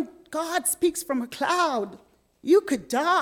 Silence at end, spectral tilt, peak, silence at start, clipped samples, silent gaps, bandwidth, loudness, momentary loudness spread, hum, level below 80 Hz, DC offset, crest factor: 0 s; -2.5 dB/octave; -10 dBFS; 0 s; under 0.1%; none; 18 kHz; -25 LUFS; 10 LU; none; -66 dBFS; under 0.1%; 16 dB